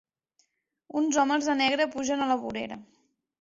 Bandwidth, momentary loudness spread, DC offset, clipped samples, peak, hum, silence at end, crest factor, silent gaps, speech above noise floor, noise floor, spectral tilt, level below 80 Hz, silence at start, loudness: 7.8 kHz; 11 LU; under 0.1%; under 0.1%; -10 dBFS; none; 0.6 s; 18 dB; none; 45 dB; -72 dBFS; -2.5 dB/octave; -68 dBFS; 0.95 s; -27 LUFS